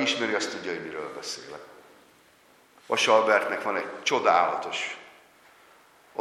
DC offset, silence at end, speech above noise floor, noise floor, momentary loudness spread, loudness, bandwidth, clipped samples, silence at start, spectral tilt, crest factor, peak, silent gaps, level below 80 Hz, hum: under 0.1%; 0 s; 32 dB; -59 dBFS; 17 LU; -26 LUFS; 13.5 kHz; under 0.1%; 0 s; -2 dB/octave; 22 dB; -6 dBFS; none; -78 dBFS; none